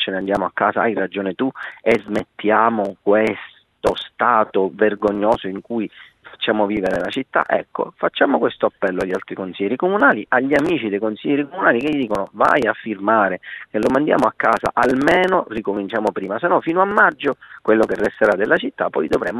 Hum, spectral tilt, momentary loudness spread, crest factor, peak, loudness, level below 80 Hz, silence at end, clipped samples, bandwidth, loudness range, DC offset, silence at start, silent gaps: none; -6 dB/octave; 9 LU; 18 dB; 0 dBFS; -19 LUFS; -52 dBFS; 0 s; under 0.1%; 12 kHz; 3 LU; under 0.1%; 0 s; none